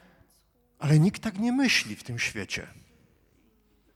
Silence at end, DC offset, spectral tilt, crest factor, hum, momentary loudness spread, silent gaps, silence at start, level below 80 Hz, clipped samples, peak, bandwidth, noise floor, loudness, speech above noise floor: 1.25 s; under 0.1%; -5 dB/octave; 20 dB; none; 12 LU; none; 0.8 s; -60 dBFS; under 0.1%; -10 dBFS; 14.5 kHz; -66 dBFS; -26 LUFS; 40 dB